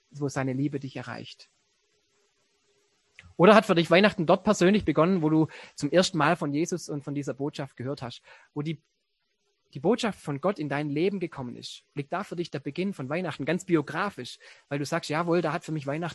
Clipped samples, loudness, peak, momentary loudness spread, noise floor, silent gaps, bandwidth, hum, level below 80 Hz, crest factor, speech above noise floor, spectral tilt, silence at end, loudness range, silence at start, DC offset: under 0.1%; -26 LUFS; -2 dBFS; 17 LU; -77 dBFS; none; 12.5 kHz; none; -62 dBFS; 26 dB; 51 dB; -5.5 dB/octave; 0 s; 10 LU; 0.15 s; under 0.1%